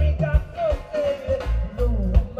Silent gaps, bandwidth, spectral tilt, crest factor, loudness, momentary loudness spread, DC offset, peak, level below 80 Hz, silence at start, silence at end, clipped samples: none; 6.4 kHz; -8.5 dB/octave; 16 dB; -24 LUFS; 4 LU; under 0.1%; -6 dBFS; -24 dBFS; 0 s; 0 s; under 0.1%